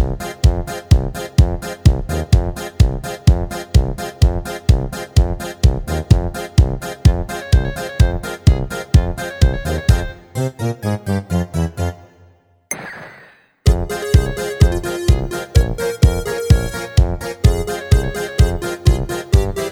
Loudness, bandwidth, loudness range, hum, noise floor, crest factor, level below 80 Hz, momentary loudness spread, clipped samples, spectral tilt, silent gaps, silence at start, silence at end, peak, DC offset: -18 LUFS; 17.5 kHz; 4 LU; none; -50 dBFS; 16 dB; -20 dBFS; 7 LU; under 0.1%; -6 dB/octave; none; 0 s; 0 s; 0 dBFS; under 0.1%